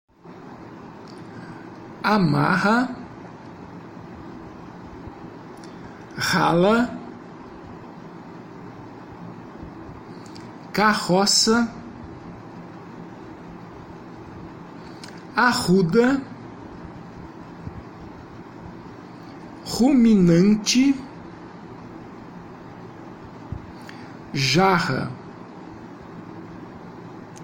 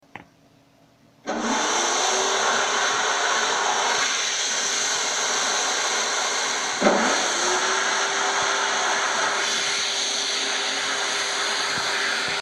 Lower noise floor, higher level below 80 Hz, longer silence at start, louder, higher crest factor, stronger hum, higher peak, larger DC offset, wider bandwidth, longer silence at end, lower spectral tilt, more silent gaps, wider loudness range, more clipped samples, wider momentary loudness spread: second, -42 dBFS vs -56 dBFS; first, -52 dBFS vs -66 dBFS; about the same, 0.25 s vs 0.15 s; about the same, -19 LUFS vs -21 LUFS; about the same, 20 dB vs 20 dB; neither; about the same, -6 dBFS vs -4 dBFS; neither; about the same, 16.5 kHz vs 15 kHz; about the same, 0 s vs 0 s; first, -4.5 dB/octave vs 0 dB/octave; neither; first, 19 LU vs 1 LU; neither; first, 23 LU vs 2 LU